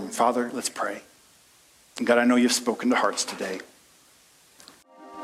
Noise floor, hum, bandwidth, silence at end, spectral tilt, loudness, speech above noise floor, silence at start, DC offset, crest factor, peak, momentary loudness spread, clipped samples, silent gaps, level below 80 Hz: -57 dBFS; none; 15 kHz; 0 s; -2.5 dB/octave; -24 LUFS; 33 dB; 0 s; under 0.1%; 20 dB; -6 dBFS; 18 LU; under 0.1%; none; -74 dBFS